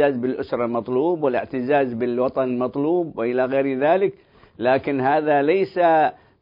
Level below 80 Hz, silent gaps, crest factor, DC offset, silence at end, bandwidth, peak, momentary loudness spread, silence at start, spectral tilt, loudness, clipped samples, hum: -62 dBFS; none; 14 dB; under 0.1%; 0.3 s; 5.4 kHz; -6 dBFS; 6 LU; 0 s; -10 dB/octave; -21 LUFS; under 0.1%; none